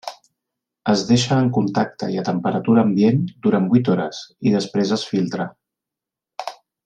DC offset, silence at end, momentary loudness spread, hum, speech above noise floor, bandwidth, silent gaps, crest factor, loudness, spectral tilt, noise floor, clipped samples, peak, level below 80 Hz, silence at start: under 0.1%; 0.3 s; 15 LU; none; 68 dB; 9.4 kHz; none; 16 dB; -19 LUFS; -6.5 dB/octave; -86 dBFS; under 0.1%; -4 dBFS; -58 dBFS; 0.05 s